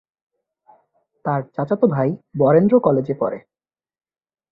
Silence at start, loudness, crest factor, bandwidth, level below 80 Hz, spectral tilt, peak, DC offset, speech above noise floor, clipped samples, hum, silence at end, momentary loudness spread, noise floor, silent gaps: 1.25 s; -19 LUFS; 18 dB; 4 kHz; -60 dBFS; -12 dB/octave; -2 dBFS; under 0.1%; 45 dB; under 0.1%; none; 1.15 s; 11 LU; -62 dBFS; none